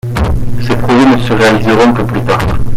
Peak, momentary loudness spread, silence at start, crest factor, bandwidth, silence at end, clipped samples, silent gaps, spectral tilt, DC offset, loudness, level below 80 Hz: 0 dBFS; 7 LU; 0.05 s; 8 dB; 15.5 kHz; 0 s; under 0.1%; none; -6.5 dB/octave; under 0.1%; -10 LUFS; -20 dBFS